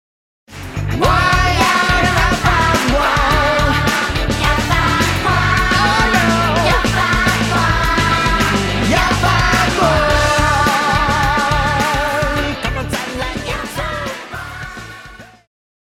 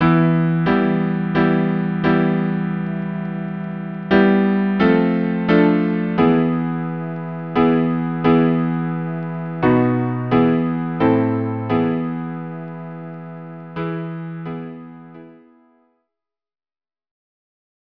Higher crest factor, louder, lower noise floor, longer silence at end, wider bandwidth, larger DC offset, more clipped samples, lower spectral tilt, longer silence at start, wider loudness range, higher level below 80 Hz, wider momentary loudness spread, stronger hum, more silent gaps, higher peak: about the same, 14 dB vs 18 dB; first, -14 LUFS vs -19 LUFS; second, -37 dBFS vs under -90 dBFS; second, 0.7 s vs 2.45 s; first, 16.5 kHz vs 5.4 kHz; second, under 0.1% vs 0.3%; neither; second, -4.5 dB/octave vs -10.5 dB/octave; first, 0.5 s vs 0 s; second, 6 LU vs 14 LU; first, -24 dBFS vs -50 dBFS; second, 9 LU vs 15 LU; neither; neither; about the same, -2 dBFS vs 0 dBFS